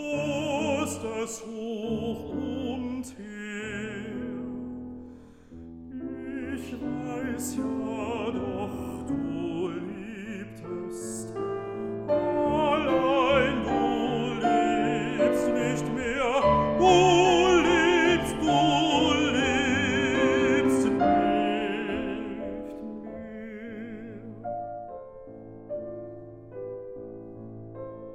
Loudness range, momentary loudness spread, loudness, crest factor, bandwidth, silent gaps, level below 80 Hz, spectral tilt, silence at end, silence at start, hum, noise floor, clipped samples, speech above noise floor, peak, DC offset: 17 LU; 19 LU; -26 LUFS; 20 dB; 15 kHz; none; -52 dBFS; -5 dB/octave; 0 s; 0 s; none; -48 dBFS; under 0.1%; 15 dB; -8 dBFS; under 0.1%